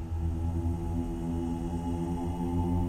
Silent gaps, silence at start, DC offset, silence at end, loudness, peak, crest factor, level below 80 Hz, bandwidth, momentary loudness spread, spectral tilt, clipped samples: none; 0 s; under 0.1%; 0 s; -33 LUFS; -18 dBFS; 12 dB; -38 dBFS; 13.5 kHz; 2 LU; -8.5 dB/octave; under 0.1%